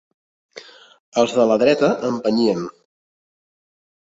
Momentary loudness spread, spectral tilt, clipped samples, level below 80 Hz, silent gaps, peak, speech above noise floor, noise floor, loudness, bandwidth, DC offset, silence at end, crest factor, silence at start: 10 LU; -5.5 dB/octave; under 0.1%; -64 dBFS; 1.00-1.12 s; -2 dBFS; 25 dB; -42 dBFS; -18 LUFS; 8 kHz; under 0.1%; 1.45 s; 18 dB; 0.55 s